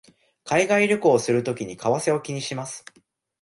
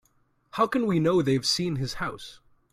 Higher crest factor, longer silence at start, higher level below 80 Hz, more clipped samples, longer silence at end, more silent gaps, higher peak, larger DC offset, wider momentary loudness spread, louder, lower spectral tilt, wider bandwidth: about the same, 18 dB vs 18 dB; about the same, 0.45 s vs 0.55 s; second, -66 dBFS vs -56 dBFS; neither; first, 0.65 s vs 0.4 s; neither; first, -6 dBFS vs -10 dBFS; neither; about the same, 13 LU vs 15 LU; first, -22 LUFS vs -25 LUFS; about the same, -4.5 dB/octave vs -5 dB/octave; second, 11.5 kHz vs 15.5 kHz